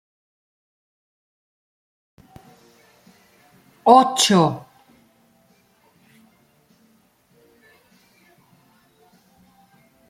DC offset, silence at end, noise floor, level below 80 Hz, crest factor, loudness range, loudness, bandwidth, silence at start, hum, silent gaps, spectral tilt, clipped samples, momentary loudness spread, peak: under 0.1%; 5.5 s; -60 dBFS; -70 dBFS; 24 dB; 4 LU; -16 LUFS; 15.5 kHz; 3.85 s; none; none; -4 dB/octave; under 0.1%; 9 LU; 0 dBFS